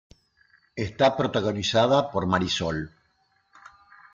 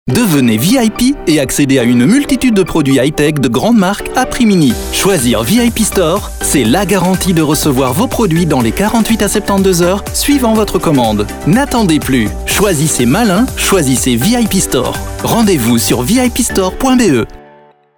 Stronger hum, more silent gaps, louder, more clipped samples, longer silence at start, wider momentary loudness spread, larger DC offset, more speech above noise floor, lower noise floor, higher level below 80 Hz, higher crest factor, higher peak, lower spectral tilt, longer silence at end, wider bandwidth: neither; neither; second, -24 LUFS vs -11 LUFS; neither; first, 0.75 s vs 0.05 s; first, 12 LU vs 3 LU; neither; first, 44 dB vs 32 dB; first, -68 dBFS vs -42 dBFS; second, -56 dBFS vs -28 dBFS; first, 18 dB vs 10 dB; second, -8 dBFS vs 0 dBFS; about the same, -5 dB/octave vs -4.5 dB/octave; first, 1.25 s vs 0.6 s; second, 7.6 kHz vs over 20 kHz